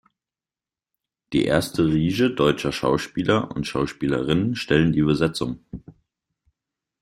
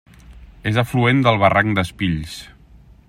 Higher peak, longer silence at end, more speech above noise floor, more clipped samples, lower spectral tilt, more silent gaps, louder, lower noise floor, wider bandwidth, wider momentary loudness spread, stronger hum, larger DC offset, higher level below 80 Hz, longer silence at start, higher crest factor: about the same, -4 dBFS vs -2 dBFS; first, 1.1 s vs 0.6 s; first, over 69 dB vs 29 dB; neither; about the same, -6 dB/octave vs -6.5 dB/octave; neither; second, -22 LUFS vs -18 LUFS; first, under -90 dBFS vs -47 dBFS; about the same, 15.5 kHz vs 15.5 kHz; second, 8 LU vs 13 LU; neither; neither; about the same, -48 dBFS vs -44 dBFS; first, 1.3 s vs 0.3 s; about the same, 20 dB vs 18 dB